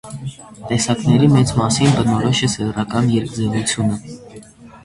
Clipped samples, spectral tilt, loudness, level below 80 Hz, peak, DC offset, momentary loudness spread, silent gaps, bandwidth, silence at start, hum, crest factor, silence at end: under 0.1%; -5.5 dB/octave; -17 LUFS; -44 dBFS; -2 dBFS; under 0.1%; 17 LU; none; 11.5 kHz; 0.05 s; none; 16 dB; 0.05 s